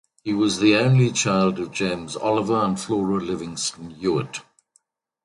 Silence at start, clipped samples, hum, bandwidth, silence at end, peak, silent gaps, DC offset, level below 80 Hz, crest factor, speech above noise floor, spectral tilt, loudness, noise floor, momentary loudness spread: 0.25 s; under 0.1%; none; 11.5 kHz; 0.85 s; -4 dBFS; none; under 0.1%; -56 dBFS; 18 dB; 44 dB; -5 dB/octave; -22 LUFS; -66 dBFS; 10 LU